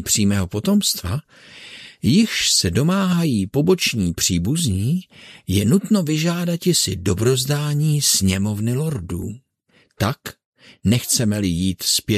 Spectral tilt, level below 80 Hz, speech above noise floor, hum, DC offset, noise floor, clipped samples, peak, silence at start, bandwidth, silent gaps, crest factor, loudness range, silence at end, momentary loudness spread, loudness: -4.5 dB/octave; -46 dBFS; 40 dB; none; under 0.1%; -59 dBFS; under 0.1%; -4 dBFS; 0 s; 14 kHz; 10.45-10.52 s; 16 dB; 4 LU; 0 s; 12 LU; -19 LUFS